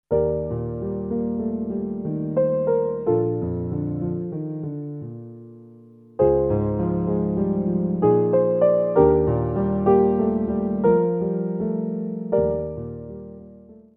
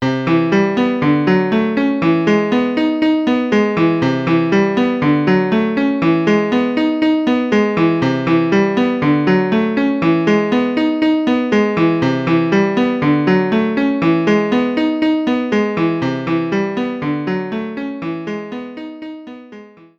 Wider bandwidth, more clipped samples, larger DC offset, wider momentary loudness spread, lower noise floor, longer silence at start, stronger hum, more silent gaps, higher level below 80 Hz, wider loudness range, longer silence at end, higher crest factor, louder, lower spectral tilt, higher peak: second, 3.3 kHz vs 7.4 kHz; neither; neither; first, 14 LU vs 9 LU; first, -47 dBFS vs -39 dBFS; about the same, 0.1 s vs 0 s; neither; neither; first, -42 dBFS vs -52 dBFS; about the same, 6 LU vs 4 LU; about the same, 0.2 s vs 0.3 s; first, 20 dB vs 14 dB; second, -22 LUFS vs -15 LUFS; first, -13.5 dB/octave vs -7.5 dB/octave; about the same, -2 dBFS vs -2 dBFS